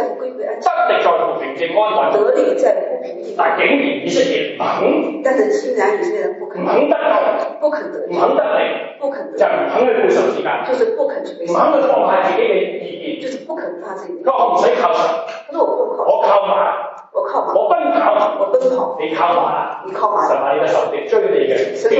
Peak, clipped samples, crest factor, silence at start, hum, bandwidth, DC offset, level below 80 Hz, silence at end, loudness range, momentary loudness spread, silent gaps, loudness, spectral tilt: -2 dBFS; under 0.1%; 14 dB; 0 s; none; 8 kHz; under 0.1%; -82 dBFS; 0 s; 2 LU; 10 LU; none; -16 LUFS; -4.5 dB/octave